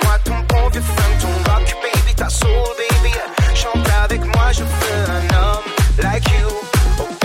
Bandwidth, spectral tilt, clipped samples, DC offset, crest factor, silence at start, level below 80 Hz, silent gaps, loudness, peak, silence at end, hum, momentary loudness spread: 16.5 kHz; -4.5 dB/octave; under 0.1%; under 0.1%; 12 dB; 0 s; -16 dBFS; none; -16 LUFS; -2 dBFS; 0 s; none; 2 LU